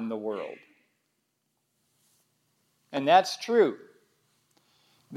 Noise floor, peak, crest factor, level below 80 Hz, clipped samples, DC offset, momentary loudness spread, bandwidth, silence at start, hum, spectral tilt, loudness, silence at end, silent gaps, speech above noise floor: -77 dBFS; -8 dBFS; 24 dB; under -90 dBFS; under 0.1%; under 0.1%; 21 LU; 14.5 kHz; 0 s; none; -4 dB/octave; -26 LUFS; 0 s; none; 52 dB